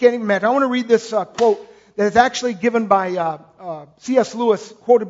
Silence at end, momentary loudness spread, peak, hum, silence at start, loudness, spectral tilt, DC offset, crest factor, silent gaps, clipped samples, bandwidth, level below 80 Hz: 0 s; 16 LU; 0 dBFS; none; 0 s; -18 LUFS; -4.5 dB/octave; under 0.1%; 18 dB; none; under 0.1%; 7.8 kHz; -58 dBFS